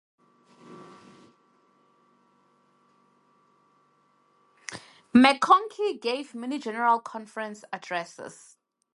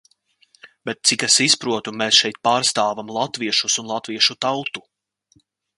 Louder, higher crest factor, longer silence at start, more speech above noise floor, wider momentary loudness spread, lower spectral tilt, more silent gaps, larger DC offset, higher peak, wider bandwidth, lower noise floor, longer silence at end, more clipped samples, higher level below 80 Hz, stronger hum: second, -25 LUFS vs -18 LUFS; about the same, 26 dB vs 22 dB; about the same, 0.7 s vs 0.65 s; about the same, 41 dB vs 41 dB; first, 25 LU vs 13 LU; first, -4 dB/octave vs -1 dB/octave; neither; neither; about the same, -2 dBFS vs 0 dBFS; about the same, 11.5 kHz vs 11.5 kHz; first, -66 dBFS vs -61 dBFS; second, 0.65 s vs 1 s; neither; second, -74 dBFS vs -68 dBFS; neither